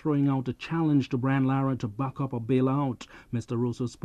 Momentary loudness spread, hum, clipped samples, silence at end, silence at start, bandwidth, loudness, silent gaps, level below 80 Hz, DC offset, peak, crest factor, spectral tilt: 7 LU; none; under 0.1%; 0.1 s; 0.05 s; 9.2 kHz; -28 LUFS; none; -58 dBFS; under 0.1%; -14 dBFS; 14 dB; -8.5 dB/octave